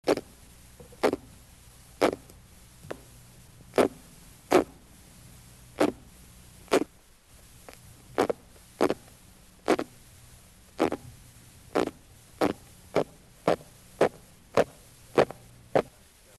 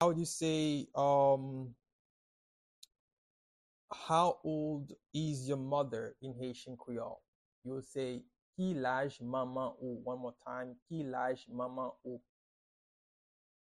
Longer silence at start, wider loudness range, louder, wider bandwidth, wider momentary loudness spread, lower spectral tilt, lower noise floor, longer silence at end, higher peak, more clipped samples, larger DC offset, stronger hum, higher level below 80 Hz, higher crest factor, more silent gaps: about the same, 0.05 s vs 0 s; about the same, 4 LU vs 6 LU; first, -29 LUFS vs -37 LUFS; about the same, 13 kHz vs 12 kHz; first, 24 LU vs 16 LU; about the same, -5 dB/octave vs -5.5 dB/octave; second, -56 dBFS vs under -90 dBFS; second, 0.55 s vs 1.4 s; first, -8 dBFS vs -18 dBFS; neither; neither; neither; first, -58 dBFS vs -74 dBFS; about the same, 24 dB vs 20 dB; second, none vs 1.92-2.82 s, 2.99-3.88 s, 7.28-7.62 s, 8.42-8.53 s, 10.82-10.86 s